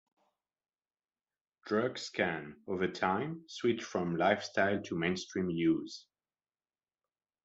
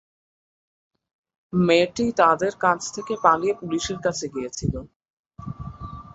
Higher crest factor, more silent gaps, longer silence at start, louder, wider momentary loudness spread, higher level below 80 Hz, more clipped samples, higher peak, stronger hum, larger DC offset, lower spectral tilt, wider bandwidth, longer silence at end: about the same, 22 dB vs 22 dB; second, none vs 4.96-5.00 s, 5.10-5.24 s; about the same, 1.65 s vs 1.55 s; second, -34 LUFS vs -22 LUFS; second, 10 LU vs 17 LU; second, -74 dBFS vs -48 dBFS; neither; second, -14 dBFS vs -2 dBFS; neither; neither; about the same, -5.5 dB/octave vs -5 dB/octave; about the same, 8 kHz vs 8.2 kHz; first, 1.45 s vs 0.15 s